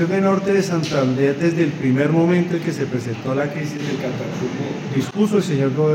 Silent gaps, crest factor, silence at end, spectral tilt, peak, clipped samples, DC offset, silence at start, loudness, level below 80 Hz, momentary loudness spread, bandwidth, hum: none; 14 dB; 0 s; -7 dB/octave; -6 dBFS; under 0.1%; under 0.1%; 0 s; -20 LUFS; -60 dBFS; 8 LU; 16 kHz; none